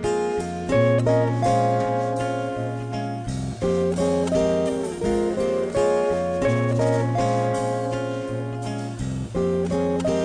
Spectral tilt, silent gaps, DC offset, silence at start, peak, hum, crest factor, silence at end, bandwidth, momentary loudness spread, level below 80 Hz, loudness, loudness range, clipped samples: -7 dB/octave; none; under 0.1%; 0 s; -8 dBFS; none; 14 dB; 0 s; 10 kHz; 8 LU; -44 dBFS; -23 LUFS; 2 LU; under 0.1%